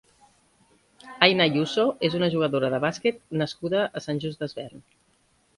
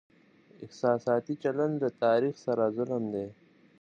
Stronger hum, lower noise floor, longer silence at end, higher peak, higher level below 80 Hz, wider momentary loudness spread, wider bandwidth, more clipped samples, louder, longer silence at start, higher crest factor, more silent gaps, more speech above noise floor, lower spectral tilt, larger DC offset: neither; first, -65 dBFS vs -60 dBFS; first, 0.8 s vs 0.5 s; first, -2 dBFS vs -12 dBFS; first, -64 dBFS vs -74 dBFS; first, 14 LU vs 11 LU; first, 11.5 kHz vs 7.4 kHz; neither; first, -24 LUFS vs -30 LUFS; first, 1.05 s vs 0.6 s; first, 26 dB vs 18 dB; neither; first, 41 dB vs 31 dB; second, -5.5 dB/octave vs -7.5 dB/octave; neither